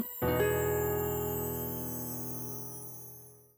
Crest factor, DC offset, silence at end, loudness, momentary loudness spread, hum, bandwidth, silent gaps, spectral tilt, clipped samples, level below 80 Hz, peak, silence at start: 16 dB; under 0.1%; 0.15 s; -33 LUFS; 14 LU; none; over 20 kHz; none; -5.5 dB/octave; under 0.1%; -52 dBFS; -18 dBFS; 0 s